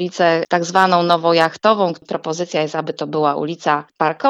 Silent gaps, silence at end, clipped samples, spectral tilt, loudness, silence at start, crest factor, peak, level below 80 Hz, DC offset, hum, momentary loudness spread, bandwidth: none; 0 s; under 0.1%; -5 dB/octave; -17 LUFS; 0 s; 16 dB; 0 dBFS; -70 dBFS; under 0.1%; none; 9 LU; 11.5 kHz